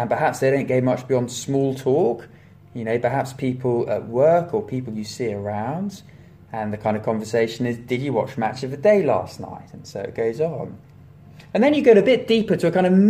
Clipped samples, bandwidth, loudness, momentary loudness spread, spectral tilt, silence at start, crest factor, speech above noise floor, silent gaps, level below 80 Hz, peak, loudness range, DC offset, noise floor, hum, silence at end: under 0.1%; 15.5 kHz; -21 LUFS; 15 LU; -6.5 dB/octave; 0 s; 18 dB; 25 dB; none; -58 dBFS; -2 dBFS; 5 LU; under 0.1%; -45 dBFS; none; 0 s